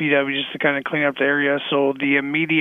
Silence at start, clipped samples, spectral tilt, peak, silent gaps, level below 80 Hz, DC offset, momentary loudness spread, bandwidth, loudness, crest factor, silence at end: 0 s; under 0.1%; -7.5 dB/octave; -4 dBFS; none; -70 dBFS; under 0.1%; 2 LU; 3.9 kHz; -20 LUFS; 16 dB; 0 s